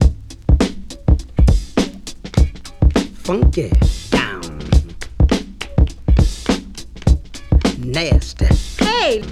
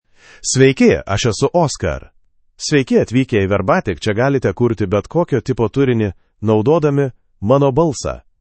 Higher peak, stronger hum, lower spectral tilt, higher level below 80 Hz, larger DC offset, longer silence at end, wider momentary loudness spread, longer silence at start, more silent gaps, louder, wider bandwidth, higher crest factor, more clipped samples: about the same, 0 dBFS vs 0 dBFS; neither; about the same, -6 dB/octave vs -5.5 dB/octave; first, -18 dBFS vs -40 dBFS; neither; second, 0 s vs 0.2 s; second, 7 LU vs 10 LU; second, 0 s vs 0.4 s; neither; about the same, -18 LUFS vs -16 LUFS; first, 12 kHz vs 8.8 kHz; about the same, 16 dB vs 16 dB; neither